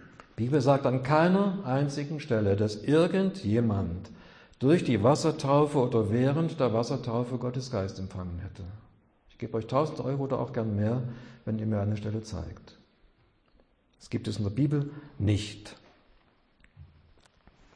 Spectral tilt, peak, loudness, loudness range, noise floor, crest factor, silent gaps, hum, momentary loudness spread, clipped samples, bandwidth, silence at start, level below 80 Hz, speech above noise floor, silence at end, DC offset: -7.5 dB/octave; -10 dBFS; -28 LUFS; 8 LU; -65 dBFS; 18 dB; none; none; 15 LU; under 0.1%; 10.5 kHz; 0 s; -56 dBFS; 37 dB; 0.9 s; under 0.1%